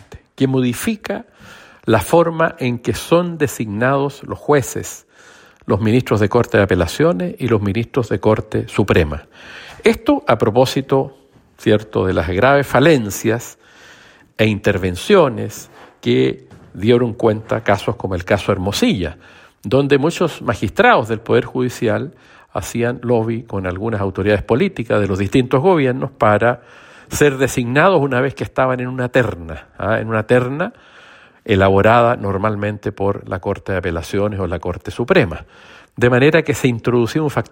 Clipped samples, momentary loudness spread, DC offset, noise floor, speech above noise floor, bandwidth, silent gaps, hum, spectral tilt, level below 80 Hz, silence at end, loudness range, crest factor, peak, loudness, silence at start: under 0.1%; 12 LU; under 0.1%; -45 dBFS; 29 dB; 16.5 kHz; none; none; -6 dB/octave; -44 dBFS; 0.1 s; 3 LU; 16 dB; 0 dBFS; -17 LUFS; 0.1 s